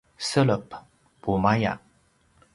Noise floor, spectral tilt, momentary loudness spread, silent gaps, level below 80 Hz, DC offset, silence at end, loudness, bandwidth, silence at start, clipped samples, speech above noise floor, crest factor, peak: -63 dBFS; -6 dB/octave; 18 LU; none; -52 dBFS; under 0.1%; 0.75 s; -25 LUFS; 11.5 kHz; 0.2 s; under 0.1%; 40 dB; 20 dB; -6 dBFS